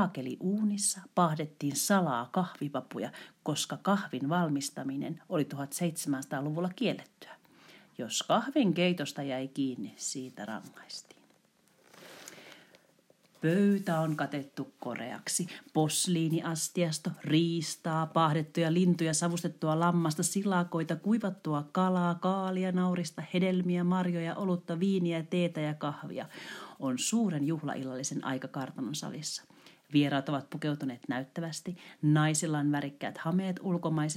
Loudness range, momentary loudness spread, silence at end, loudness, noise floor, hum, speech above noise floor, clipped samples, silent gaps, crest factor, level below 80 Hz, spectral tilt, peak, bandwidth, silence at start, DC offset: 5 LU; 12 LU; 0 s; -32 LUFS; -67 dBFS; none; 36 dB; under 0.1%; none; 18 dB; -84 dBFS; -5 dB/octave; -14 dBFS; 16 kHz; 0 s; under 0.1%